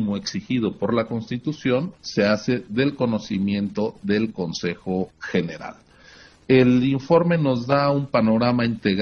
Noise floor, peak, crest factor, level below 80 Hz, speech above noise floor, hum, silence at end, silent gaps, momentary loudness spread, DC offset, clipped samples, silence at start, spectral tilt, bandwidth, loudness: -49 dBFS; -4 dBFS; 18 dB; -56 dBFS; 27 dB; none; 0 s; none; 9 LU; under 0.1%; under 0.1%; 0 s; -6.5 dB/octave; 6.8 kHz; -22 LUFS